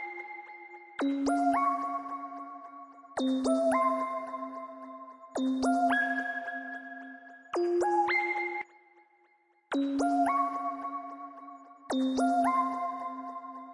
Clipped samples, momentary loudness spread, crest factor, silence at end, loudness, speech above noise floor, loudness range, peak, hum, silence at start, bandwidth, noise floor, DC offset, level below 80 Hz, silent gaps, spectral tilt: under 0.1%; 18 LU; 16 dB; 0 s; -31 LUFS; 40 dB; 3 LU; -16 dBFS; none; 0 s; 11.5 kHz; -68 dBFS; under 0.1%; -70 dBFS; none; -3.5 dB/octave